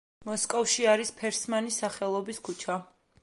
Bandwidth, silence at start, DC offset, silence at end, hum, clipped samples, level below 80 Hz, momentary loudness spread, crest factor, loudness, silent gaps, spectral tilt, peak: 11.5 kHz; 0.2 s; under 0.1%; 0.4 s; none; under 0.1%; -72 dBFS; 11 LU; 20 dB; -29 LUFS; none; -2 dB/octave; -10 dBFS